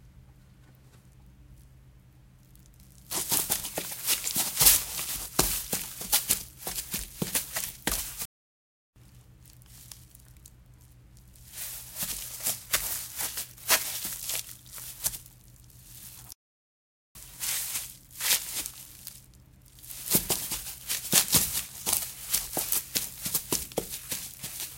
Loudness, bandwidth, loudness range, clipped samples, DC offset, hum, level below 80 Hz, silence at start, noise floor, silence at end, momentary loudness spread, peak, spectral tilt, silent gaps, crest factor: -28 LUFS; 17 kHz; 12 LU; under 0.1%; under 0.1%; none; -52 dBFS; 0.05 s; -56 dBFS; 0 s; 19 LU; -4 dBFS; -1 dB/octave; 8.25-8.93 s, 16.35-17.15 s; 30 dB